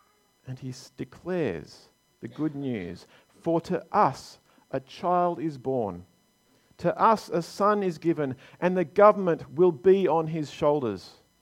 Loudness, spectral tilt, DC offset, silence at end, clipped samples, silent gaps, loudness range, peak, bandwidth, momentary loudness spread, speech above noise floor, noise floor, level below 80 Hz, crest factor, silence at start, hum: -26 LUFS; -7 dB/octave; under 0.1%; 0.3 s; under 0.1%; none; 9 LU; -4 dBFS; 13.5 kHz; 19 LU; 39 dB; -65 dBFS; -64 dBFS; 22 dB; 0.45 s; none